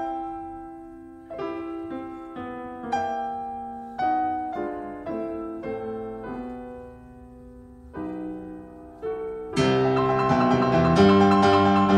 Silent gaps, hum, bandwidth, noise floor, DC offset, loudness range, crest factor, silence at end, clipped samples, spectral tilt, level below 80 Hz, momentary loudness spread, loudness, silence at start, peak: none; none; 11 kHz; -45 dBFS; under 0.1%; 15 LU; 20 dB; 0 s; under 0.1%; -7 dB/octave; -50 dBFS; 22 LU; -24 LUFS; 0 s; -4 dBFS